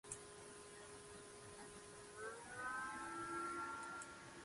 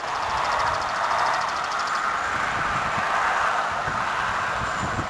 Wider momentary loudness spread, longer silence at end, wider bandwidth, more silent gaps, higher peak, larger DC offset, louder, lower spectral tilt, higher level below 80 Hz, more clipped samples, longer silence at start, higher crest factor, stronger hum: first, 10 LU vs 3 LU; about the same, 0 s vs 0 s; about the same, 11.5 kHz vs 11 kHz; neither; second, -32 dBFS vs -10 dBFS; neither; second, -50 LUFS vs -24 LUFS; about the same, -2.5 dB/octave vs -3 dB/octave; second, -76 dBFS vs -48 dBFS; neither; about the same, 0.05 s vs 0 s; first, 20 dB vs 14 dB; neither